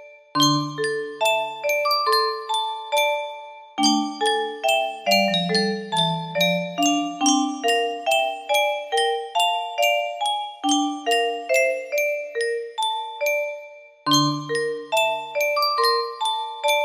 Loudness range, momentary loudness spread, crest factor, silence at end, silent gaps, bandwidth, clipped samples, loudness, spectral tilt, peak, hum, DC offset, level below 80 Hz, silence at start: 2 LU; 6 LU; 18 dB; 0 s; none; 15.5 kHz; under 0.1%; -22 LUFS; -3 dB/octave; -4 dBFS; none; under 0.1%; -72 dBFS; 0 s